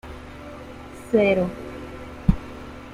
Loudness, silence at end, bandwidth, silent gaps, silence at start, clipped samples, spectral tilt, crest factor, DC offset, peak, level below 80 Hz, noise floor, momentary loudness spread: -23 LUFS; 0 s; 13.5 kHz; none; 0.05 s; under 0.1%; -7.5 dB/octave; 22 dB; under 0.1%; -4 dBFS; -34 dBFS; -39 dBFS; 20 LU